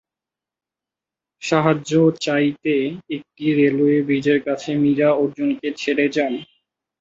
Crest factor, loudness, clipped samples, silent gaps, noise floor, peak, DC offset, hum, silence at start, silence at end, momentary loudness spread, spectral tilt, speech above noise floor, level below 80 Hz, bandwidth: 18 dB; -19 LUFS; under 0.1%; none; -88 dBFS; -2 dBFS; under 0.1%; none; 1.4 s; 0.55 s; 8 LU; -6.5 dB/octave; 70 dB; -64 dBFS; 7.8 kHz